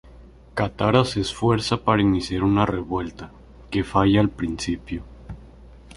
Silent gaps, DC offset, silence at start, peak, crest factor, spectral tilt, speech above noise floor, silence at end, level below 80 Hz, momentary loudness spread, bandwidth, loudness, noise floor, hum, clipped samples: none; under 0.1%; 0.05 s; -2 dBFS; 20 dB; -6.5 dB/octave; 25 dB; 0 s; -42 dBFS; 22 LU; 11.5 kHz; -22 LUFS; -46 dBFS; none; under 0.1%